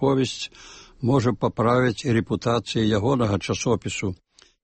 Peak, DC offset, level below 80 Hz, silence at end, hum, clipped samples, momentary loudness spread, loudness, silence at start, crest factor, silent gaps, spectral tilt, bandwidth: -8 dBFS; under 0.1%; -50 dBFS; 0.5 s; none; under 0.1%; 11 LU; -23 LUFS; 0 s; 16 dB; none; -6 dB/octave; 8.8 kHz